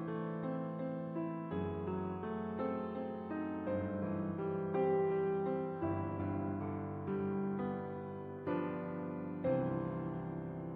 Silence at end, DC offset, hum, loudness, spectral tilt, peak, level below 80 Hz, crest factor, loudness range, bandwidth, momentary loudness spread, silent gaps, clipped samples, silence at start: 0 s; under 0.1%; none; -39 LUFS; -8.5 dB/octave; -22 dBFS; -68 dBFS; 16 dB; 3 LU; 4.5 kHz; 7 LU; none; under 0.1%; 0 s